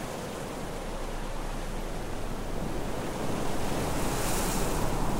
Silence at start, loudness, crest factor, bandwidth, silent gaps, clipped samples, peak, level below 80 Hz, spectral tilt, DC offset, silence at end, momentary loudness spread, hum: 0 s; -33 LUFS; 16 dB; 16 kHz; none; under 0.1%; -14 dBFS; -36 dBFS; -4.5 dB/octave; under 0.1%; 0 s; 8 LU; none